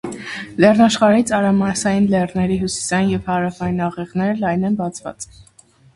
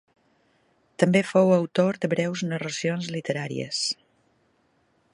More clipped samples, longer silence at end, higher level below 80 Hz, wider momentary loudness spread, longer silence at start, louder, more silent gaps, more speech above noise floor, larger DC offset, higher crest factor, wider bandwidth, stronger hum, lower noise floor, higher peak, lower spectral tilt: neither; second, 0.55 s vs 1.2 s; first, -46 dBFS vs -70 dBFS; first, 15 LU vs 9 LU; second, 0.05 s vs 1 s; first, -17 LUFS vs -25 LUFS; neither; second, 34 dB vs 43 dB; neither; about the same, 18 dB vs 22 dB; about the same, 11.5 kHz vs 11.5 kHz; neither; second, -50 dBFS vs -67 dBFS; first, 0 dBFS vs -4 dBFS; about the same, -5.5 dB/octave vs -5.5 dB/octave